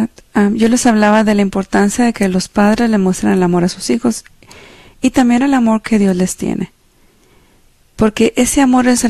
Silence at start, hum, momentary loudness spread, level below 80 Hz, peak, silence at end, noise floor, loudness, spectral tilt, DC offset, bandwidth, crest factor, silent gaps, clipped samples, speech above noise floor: 0 s; none; 7 LU; -40 dBFS; 0 dBFS; 0 s; -50 dBFS; -13 LUFS; -5 dB/octave; under 0.1%; 13.5 kHz; 12 dB; none; under 0.1%; 38 dB